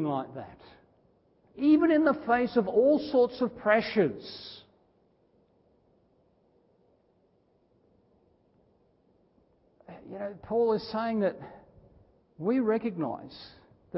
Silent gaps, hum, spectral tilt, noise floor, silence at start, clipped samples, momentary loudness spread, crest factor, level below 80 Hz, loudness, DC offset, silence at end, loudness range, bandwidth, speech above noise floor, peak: none; none; -10 dB/octave; -68 dBFS; 0 s; under 0.1%; 22 LU; 22 dB; -66 dBFS; -27 LUFS; under 0.1%; 0 s; 11 LU; 5.8 kHz; 41 dB; -10 dBFS